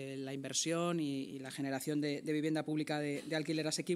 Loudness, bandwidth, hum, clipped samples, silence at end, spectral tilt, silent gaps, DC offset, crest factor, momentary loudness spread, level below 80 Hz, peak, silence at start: -37 LUFS; 15.5 kHz; none; under 0.1%; 0 s; -4.5 dB/octave; none; under 0.1%; 16 dB; 7 LU; -88 dBFS; -22 dBFS; 0 s